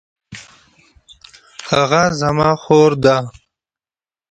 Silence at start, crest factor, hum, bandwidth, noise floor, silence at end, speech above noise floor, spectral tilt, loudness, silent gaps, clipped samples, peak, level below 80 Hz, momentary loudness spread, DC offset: 0.3 s; 18 dB; none; 9 kHz; under -90 dBFS; 1 s; over 77 dB; -5.5 dB/octave; -14 LUFS; none; under 0.1%; 0 dBFS; -48 dBFS; 24 LU; under 0.1%